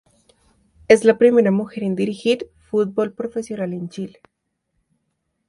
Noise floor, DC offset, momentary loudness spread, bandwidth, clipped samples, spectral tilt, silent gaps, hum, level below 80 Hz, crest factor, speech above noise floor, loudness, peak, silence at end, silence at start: -73 dBFS; under 0.1%; 14 LU; 11.5 kHz; under 0.1%; -6 dB/octave; none; none; -60 dBFS; 20 dB; 55 dB; -19 LUFS; 0 dBFS; 1.4 s; 0.9 s